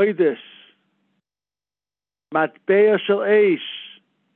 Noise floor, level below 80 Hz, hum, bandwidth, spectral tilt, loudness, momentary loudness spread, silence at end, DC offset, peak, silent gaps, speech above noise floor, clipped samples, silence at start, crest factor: under -90 dBFS; -82 dBFS; none; 4 kHz; -9 dB/octave; -19 LUFS; 15 LU; 0.5 s; under 0.1%; -6 dBFS; none; over 72 dB; under 0.1%; 0 s; 16 dB